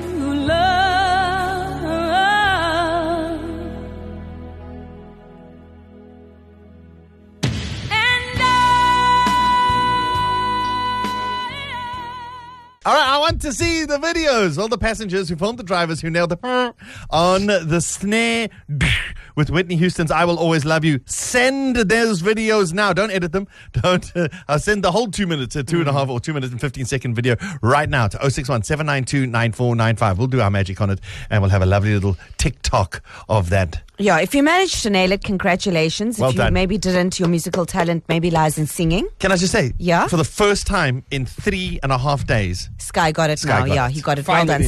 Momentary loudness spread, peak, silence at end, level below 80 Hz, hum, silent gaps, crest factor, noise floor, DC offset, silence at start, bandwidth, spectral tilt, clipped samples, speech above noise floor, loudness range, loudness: 9 LU; -4 dBFS; 0 s; -36 dBFS; none; none; 14 dB; -45 dBFS; under 0.1%; 0 s; 13 kHz; -5 dB/octave; under 0.1%; 27 dB; 4 LU; -18 LUFS